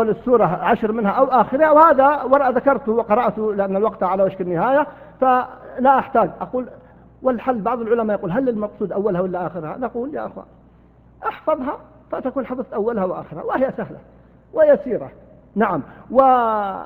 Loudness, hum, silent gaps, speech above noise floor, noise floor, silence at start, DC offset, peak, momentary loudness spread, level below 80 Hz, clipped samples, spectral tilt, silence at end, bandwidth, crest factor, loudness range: -19 LUFS; none; none; 31 dB; -49 dBFS; 0 s; under 0.1%; 0 dBFS; 13 LU; -52 dBFS; under 0.1%; -9.5 dB/octave; 0 s; 15.5 kHz; 18 dB; 10 LU